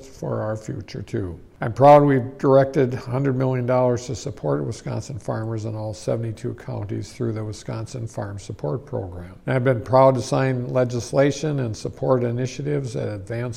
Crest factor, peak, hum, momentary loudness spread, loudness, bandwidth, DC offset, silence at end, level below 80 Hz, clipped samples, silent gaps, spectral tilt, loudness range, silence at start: 18 dB; -2 dBFS; none; 14 LU; -22 LUFS; 11.5 kHz; under 0.1%; 0 s; -52 dBFS; under 0.1%; none; -7 dB/octave; 10 LU; 0 s